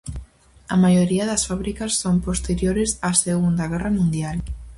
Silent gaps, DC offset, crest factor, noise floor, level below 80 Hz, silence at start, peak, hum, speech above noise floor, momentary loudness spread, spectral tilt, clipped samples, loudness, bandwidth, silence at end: none; under 0.1%; 18 dB; -45 dBFS; -36 dBFS; 0.05 s; -2 dBFS; none; 25 dB; 9 LU; -5 dB/octave; under 0.1%; -21 LUFS; 11.5 kHz; 0 s